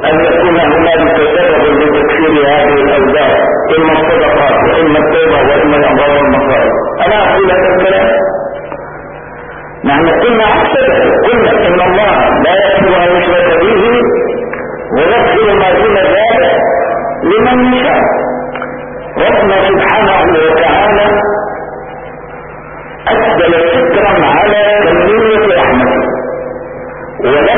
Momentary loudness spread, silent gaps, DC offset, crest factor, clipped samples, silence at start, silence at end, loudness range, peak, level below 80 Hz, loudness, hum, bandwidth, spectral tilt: 14 LU; none; 0.3%; 8 dB; under 0.1%; 0 s; 0 s; 3 LU; 0 dBFS; -32 dBFS; -8 LUFS; none; 3.7 kHz; -10 dB/octave